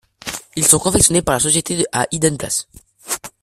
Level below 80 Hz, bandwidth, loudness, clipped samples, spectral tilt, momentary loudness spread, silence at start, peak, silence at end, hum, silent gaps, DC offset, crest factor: -40 dBFS; 16 kHz; -15 LUFS; under 0.1%; -3 dB/octave; 14 LU; 0.25 s; 0 dBFS; 0.15 s; none; none; under 0.1%; 18 dB